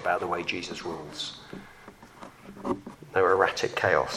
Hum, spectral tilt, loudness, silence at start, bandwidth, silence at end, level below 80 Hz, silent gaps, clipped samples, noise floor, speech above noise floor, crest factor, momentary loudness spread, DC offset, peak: none; -4 dB/octave; -28 LUFS; 0 s; 14.5 kHz; 0 s; -60 dBFS; none; under 0.1%; -50 dBFS; 22 dB; 22 dB; 24 LU; under 0.1%; -6 dBFS